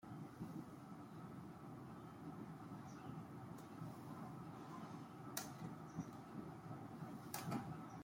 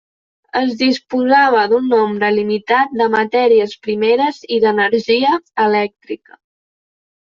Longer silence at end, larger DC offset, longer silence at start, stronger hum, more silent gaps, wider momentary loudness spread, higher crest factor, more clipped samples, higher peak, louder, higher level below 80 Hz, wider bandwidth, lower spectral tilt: second, 0 s vs 1.05 s; neither; second, 0 s vs 0.55 s; neither; neither; about the same, 7 LU vs 7 LU; first, 24 dB vs 14 dB; neither; second, -28 dBFS vs -2 dBFS; second, -53 LUFS vs -15 LUFS; second, -78 dBFS vs -62 dBFS; first, 16.5 kHz vs 7.2 kHz; about the same, -5.5 dB/octave vs -5.5 dB/octave